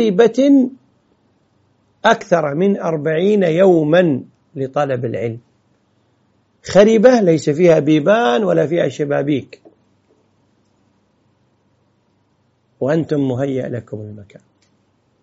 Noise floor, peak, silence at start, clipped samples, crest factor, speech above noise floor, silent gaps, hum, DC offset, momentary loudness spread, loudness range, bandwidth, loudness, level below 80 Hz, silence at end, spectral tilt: -61 dBFS; 0 dBFS; 0 s; under 0.1%; 16 dB; 47 dB; none; none; under 0.1%; 15 LU; 11 LU; 8 kHz; -15 LUFS; -58 dBFS; 1 s; -6 dB/octave